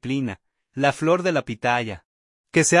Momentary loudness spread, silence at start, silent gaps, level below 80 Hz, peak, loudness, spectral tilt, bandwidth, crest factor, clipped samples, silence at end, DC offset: 17 LU; 0.05 s; 2.05-2.44 s; -58 dBFS; -4 dBFS; -22 LUFS; -4.5 dB/octave; 11.5 kHz; 20 dB; under 0.1%; 0 s; under 0.1%